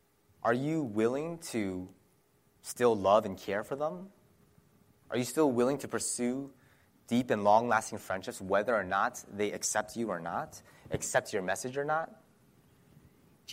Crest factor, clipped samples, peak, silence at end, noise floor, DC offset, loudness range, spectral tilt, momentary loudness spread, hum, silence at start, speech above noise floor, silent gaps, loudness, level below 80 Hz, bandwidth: 20 dB; under 0.1%; -12 dBFS; 0 s; -69 dBFS; under 0.1%; 4 LU; -4.5 dB/octave; 13 LU; none; 0.45 s; 37 dB; none; -32 LUFS; -68 dBFS; 16 kHz